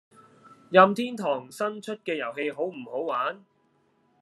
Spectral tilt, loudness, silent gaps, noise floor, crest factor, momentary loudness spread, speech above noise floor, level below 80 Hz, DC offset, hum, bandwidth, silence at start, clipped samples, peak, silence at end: -5.5 dB/octave; -26 LUFS; none; -67 dBFS; 24 dB; 14 LU; 41 dB; -82 dBFS; under 0.1%; none; 12.5 kHz; 0.7 s; under 0.1%; -2 dBFS; 0.85 s